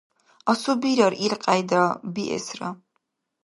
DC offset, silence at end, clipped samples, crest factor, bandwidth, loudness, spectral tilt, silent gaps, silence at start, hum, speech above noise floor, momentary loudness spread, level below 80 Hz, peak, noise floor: under 0.1%; 0.7 s; under 0.1%; 20 dB; 11.5 kHz; -23 LUFS; -4.5 dB/octave; none; 0.45 s; none; 53 dB; 12 LU; -70 dBFS; -4 dBFS; -75 dBFS